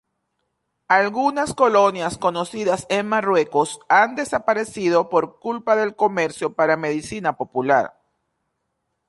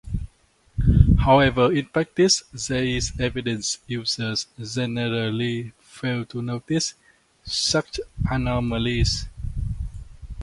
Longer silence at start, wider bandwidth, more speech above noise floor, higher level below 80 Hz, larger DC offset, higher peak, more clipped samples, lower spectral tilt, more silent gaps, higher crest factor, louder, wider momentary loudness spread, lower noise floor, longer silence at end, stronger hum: first, 0.9 s vs 0.05 s; about the same, 11.5 kHz vs 11.5 kHz; first, 55 dB vs 35 dB; second, -60 dBFS vs -32 dBFS; neither; about the same, -2 dBFS vs 0 dBFS; neither; about the same, -4.5 dB/octave vs -4.5 dB/octave; neither; about the same, 18 dB vs 22 dB; first, -20 LUFS vs -23 LUFS; second, 7 LU vs 16 LU; first, -75 dBFS vs -59 dBFS; first, 1.2 s vs 0 s; neither